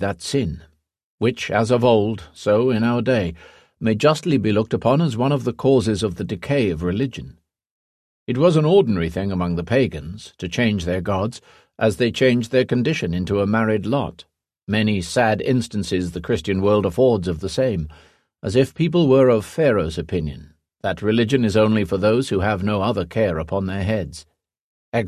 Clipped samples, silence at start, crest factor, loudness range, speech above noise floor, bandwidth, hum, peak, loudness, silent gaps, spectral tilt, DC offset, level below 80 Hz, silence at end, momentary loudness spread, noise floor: under 0.1%; 0 s; 18 dB; 2 LU; over 71 dB; 14 kHz; none; -2 dBFS; -20 LUFS; 1.04-1.18 s, 7.71-8.26 s, 14.63-14.67 s, 24.60-24.92 s; -6.5 dB/octave; under 0.1%; -40 dBFS; 0 s; 10 LU; under -90 dBFS